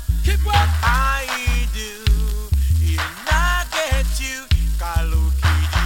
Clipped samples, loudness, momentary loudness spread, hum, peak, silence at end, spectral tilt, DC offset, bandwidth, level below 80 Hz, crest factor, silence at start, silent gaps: under 0.1%; -20 LUFS; 5 LU; none; -4 dBFS; 0 s; -4 dB/octave; under 0.1%; 17.5 kHz; -20 dBFS; 14 dB; 0 s; none